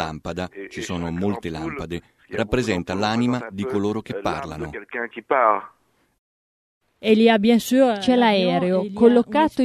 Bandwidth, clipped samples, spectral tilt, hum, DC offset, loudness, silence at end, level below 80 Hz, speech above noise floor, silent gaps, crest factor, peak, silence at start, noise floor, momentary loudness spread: 13.5 kHz; under 0.1%; -6 dB/octave; none; under 0.1%; -21 LUFS; 0 s; -48 dBFS; over 70 dB; 6.18-6.81 s; 20 dB; -2 dBFS; 0 s; under -90 dBFS; 14 LU